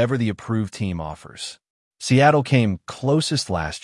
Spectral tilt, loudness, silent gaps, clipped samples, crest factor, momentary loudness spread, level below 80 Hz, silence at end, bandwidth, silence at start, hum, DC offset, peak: -5.5 dB/octave; -21 LUFS; 1.70-1.91 s; under 0.1%; 18 dB; 17 LU; -50 dBFS; 0.05 s; 11.5 kHz; 0 s; none; under 0.1%; -4 dBFS